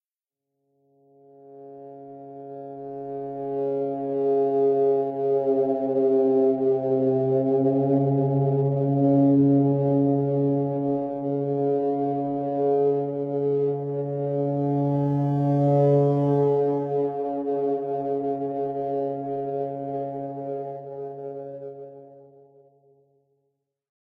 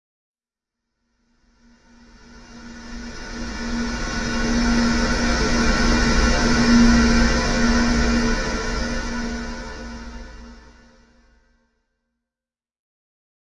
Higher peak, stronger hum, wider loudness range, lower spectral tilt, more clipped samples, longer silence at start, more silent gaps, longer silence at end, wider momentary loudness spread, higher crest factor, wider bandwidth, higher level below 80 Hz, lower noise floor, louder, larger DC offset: second, -10 dBFS vs -4 dBFS; neither; second, 13 LU vs 18 LU; first, -12.5 dB/octave vs -4.5 dB/octave; neither; second, 1.45 s vs 2.35 s; neither; second, 1.75 s vs 3 s; second, 16 LU vs 20 LU; about the same, 14 dB vs 18 dB; second, 3.6 kHz vs 10.5 kHz; second, -70 dBFS vs -28 dBFS; about the same, -89 dBFS vs under -90 dBFS; second, -24 LUFS vs -20 LUFS; neither